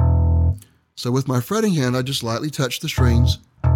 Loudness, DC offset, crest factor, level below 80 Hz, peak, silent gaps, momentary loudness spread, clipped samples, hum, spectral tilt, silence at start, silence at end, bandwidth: -20 LUFS; under 0.1%; 14 dB; -26 dBFS; -4 dBFS; none; 6 LU; under 0.1%; none; -6 dB/octave; 0 s; 0 s; 17 kHz